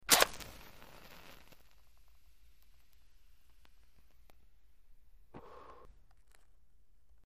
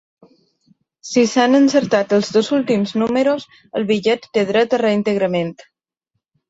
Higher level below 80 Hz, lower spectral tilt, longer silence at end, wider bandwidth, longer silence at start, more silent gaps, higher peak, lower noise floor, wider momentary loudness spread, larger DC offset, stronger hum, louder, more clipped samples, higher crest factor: about the same, -62 dBFS vs -60 dBFS; second, 0 dB/octave vs -5 dB/octave; first, 1.85 s vs 0.95 s; first, 15.5 kHz vs 8 kHz; second, 0.1 s vs 1.05 s; neither; about the same, -4 dBFS vs -2 dBFS; second, -69 dBFS vs -76 dBFS; first, 31 LU vs 10 LU; first, 0.1% vs under 0.1%; neither; second, -30 LUFS vs -17 LUFS; neither; first, 38 dB vs 16 dB